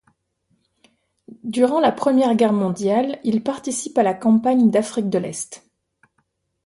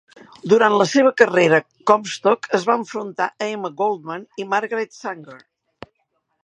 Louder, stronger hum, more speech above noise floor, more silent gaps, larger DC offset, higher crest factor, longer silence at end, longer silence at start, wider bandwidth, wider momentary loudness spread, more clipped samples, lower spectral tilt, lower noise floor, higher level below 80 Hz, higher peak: about the same, -19 LUFS vs -19 LUFS; neither; about the same, 51 dB vs 52 dB; neither; neither; about the same, 16 dB vs 20 dB; about the same, 1.1 s vs 1.05 s; first, 1.45 s vs 0.45 s; about the same, 11.5 kHz vs 10.5 kHz; second, 11 LU vs 16 LU; neither; about the same, -5.5 dB/octave vs -4.5 dB/octave; about the same, -70 dBFS vs -71 dBFS; about the same, -66 dBFS vs -68 dBFS; second, -4 dBFS vs 0 dBFS